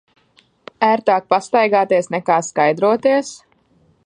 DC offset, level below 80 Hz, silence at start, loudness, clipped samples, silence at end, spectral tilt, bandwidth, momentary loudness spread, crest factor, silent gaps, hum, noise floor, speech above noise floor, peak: under 0.1%; -68 dBFS; 0.8 s; -16 LUFS; under 0.1%; 0.7 s; -4.5 dB/octave; 10.5 kHz; 4 LU; 16 dB; none; none; -57 dBFS; 41 dB; 0 dBFS